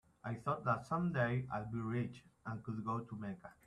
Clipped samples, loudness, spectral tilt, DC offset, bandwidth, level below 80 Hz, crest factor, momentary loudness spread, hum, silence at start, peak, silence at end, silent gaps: under 0.1%; -40 LUFS; -8.5 dB/octave; under 0.1%; 10.5 kHz; -68 dBFS; 18 dB; 10 LU; none; 0.25 s; -22 dBFS; 0.15 s; none